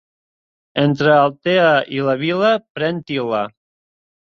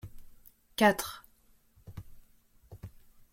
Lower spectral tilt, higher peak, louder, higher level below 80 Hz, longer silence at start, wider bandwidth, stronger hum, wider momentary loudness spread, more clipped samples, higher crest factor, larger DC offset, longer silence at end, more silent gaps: first, -7 dB/octave vs -4 dB/octave; first, -2 dBFS vs -10 dBFS; first, -17 LUFS vs -29 LUFS; about the same, -60 dBFS vs -58 dBFS; first, 0.75 s vs 0.05 s; second, 6.8 kHz vs 16.5 kHz; neither; second, 9 LU vs 25 LU; neither; second, 16 dB vs 26 dB; neither; first, 0.75 s vs 0.45 s; first, 2.70-2.75 s vs none